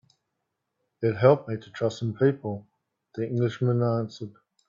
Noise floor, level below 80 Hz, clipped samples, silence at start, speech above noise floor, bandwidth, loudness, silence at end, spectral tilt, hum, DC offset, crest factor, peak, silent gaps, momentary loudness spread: -81 dBFS; -68 dBFS; under 0.1%; 1 s; 56 dB; 7.4 kHz; -26 LUFS; 0.4 s; -8 dB/octave; none; under 0.1%; 22 dB; -6 dBFS; none; 17 LU